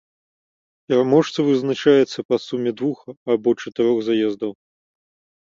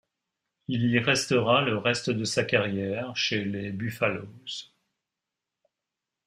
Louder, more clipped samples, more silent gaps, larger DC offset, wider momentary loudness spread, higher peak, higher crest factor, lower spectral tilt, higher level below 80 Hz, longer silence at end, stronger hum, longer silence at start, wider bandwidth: first, -20 LUFS vs -26 LUFS; neither; first, 2.25-2.29 s, 3.17-3.26 s vs none; neither; second, 10 LU vs 14 LU; first, -2 dBFS vs -8 dBFS; about the same, 18 dB vs 22 dB; first, -6.5 dB/octave vs -4.5 dB/octave; about the same, -66 dBFS vs -66 dBFS; second, 0.9 s vs 1.65 s; neither; first, 0.9 s vs 0.7 s; second, 7.6 kHz vs 15.5 kHz